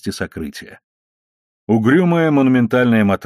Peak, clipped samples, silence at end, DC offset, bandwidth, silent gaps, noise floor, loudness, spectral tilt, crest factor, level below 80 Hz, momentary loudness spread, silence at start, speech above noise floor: -2 dBFS; under 0.1%; 0 s; under 0.1%; 13.5 kHz; 0.84-1.67 s; under -90 dBFS; -15 LUFS; -7.5 dB/octave; 14 dB; -52 dBFS; 15 LU; 0.05 s; over 75 dB